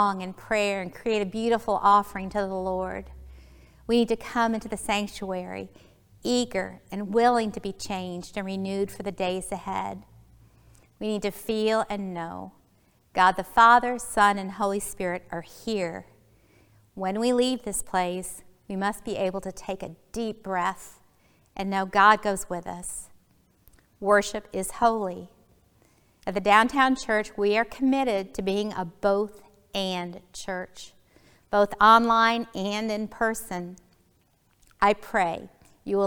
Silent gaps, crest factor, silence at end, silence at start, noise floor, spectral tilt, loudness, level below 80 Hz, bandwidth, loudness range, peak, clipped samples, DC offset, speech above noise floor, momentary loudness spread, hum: none; 24 dB; 0 s; 0 s; -65 dBFS; -4 dB/octave; -26 LUFS; -54 dBFS; 20 kHz; 8 LU; -4 dBFS; under 0.1%; under 0.1%; 40 dB; 16 LU; none